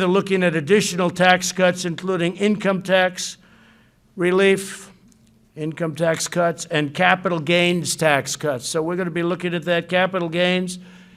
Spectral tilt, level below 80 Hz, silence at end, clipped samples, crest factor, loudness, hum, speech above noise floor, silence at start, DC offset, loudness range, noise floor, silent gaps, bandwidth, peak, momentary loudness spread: -4.5 dB/octave; -62 dBFS; 0.2 s; under 0.1%; 20 dB; -20 LUFS; none; 34 dB; 0 s; under 0.1%; 4 LU; -54 dBFS; none; 15.5 kHz; 0 dBFS; 9 LU